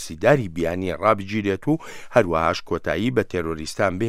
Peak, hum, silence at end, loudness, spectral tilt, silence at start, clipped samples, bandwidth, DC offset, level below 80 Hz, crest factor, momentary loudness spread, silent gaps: 0 dBFS; none; 0 s; -22 LUFS; -6 dB/octave; 0 s; under 0.1%; 15 kHz; under 0.1%; -46 dBFS; 20 dB; 7 LU; none